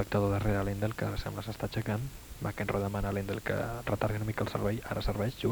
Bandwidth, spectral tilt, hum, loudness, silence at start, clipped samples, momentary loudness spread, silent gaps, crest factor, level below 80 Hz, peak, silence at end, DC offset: over 20 kHz; -6.5 dB/octave; none; -34 LUFS; 0 s; under 0.1%; 7 LU; none; 18 dB; -44 dBFS; -14 dBFS; 0 s; under 0.1%